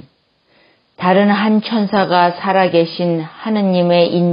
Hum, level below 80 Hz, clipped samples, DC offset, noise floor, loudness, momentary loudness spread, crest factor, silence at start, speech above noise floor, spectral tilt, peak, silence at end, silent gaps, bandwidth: none; -64 dBFS; under 0.1%; under 0.1%; -58 dBFS; -14 LUFS; 7 LU; 14 dB; 1 s; 44 dB; -11 dB/octave; 0 dBFS; 0 s; none; 5.4 kHz